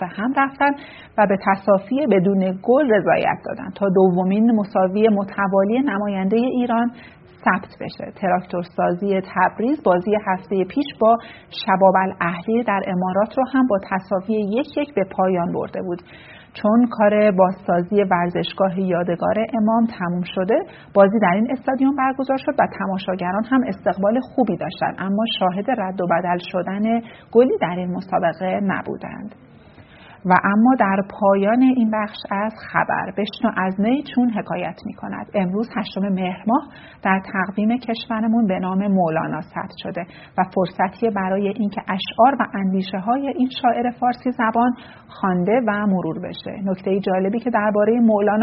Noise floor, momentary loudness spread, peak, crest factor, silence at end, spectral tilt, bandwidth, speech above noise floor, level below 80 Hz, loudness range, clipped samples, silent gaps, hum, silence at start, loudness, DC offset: -45 dBFS; 9 LU; 0 dBFS; 18 dB; 0 s; -5.5 dB/octave; 5.8 kHz; 26 dB; -58 dBFS; 4 LU; under 0.1%; none; none; 0 s; -20 LUFS; under 0.1%